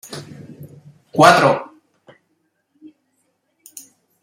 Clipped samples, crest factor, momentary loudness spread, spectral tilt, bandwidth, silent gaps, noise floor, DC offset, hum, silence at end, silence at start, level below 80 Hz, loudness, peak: under 0.1%; 20 dB; 29 LU; -4.5 dB/octave; 16 kHz; none; -68 dBFS; under 0.1%; none; 2.6 s; 0.1 s; -62 dBFS; -14 LUFS; 0 dBFS